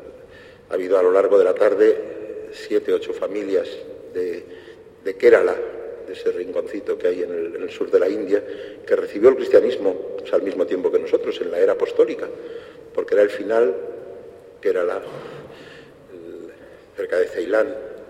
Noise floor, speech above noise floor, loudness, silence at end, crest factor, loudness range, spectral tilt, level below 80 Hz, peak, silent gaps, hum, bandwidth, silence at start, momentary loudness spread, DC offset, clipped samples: -44 dBFS; 24 dB; -20 LUFS; 0.05 s; 20 dB; 7 LU; -5.5 dB/octave; -62 dBFS; -2 dBFS; none; none; 10 kHz; 0 s; 21 LU; under 0.1%; under 0.1%